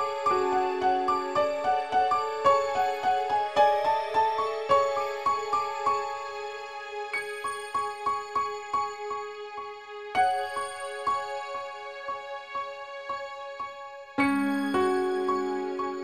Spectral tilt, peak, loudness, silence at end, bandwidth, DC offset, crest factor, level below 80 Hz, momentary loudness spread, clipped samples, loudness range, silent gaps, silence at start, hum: -4 dB/octave; -10 dBFS; -28 LUFS; 0 s; 14.5 kHz; 0.1%; 18 dB; -64 dBFS; 13 LU; under 0.1%; 7 LU; none; 0 s; none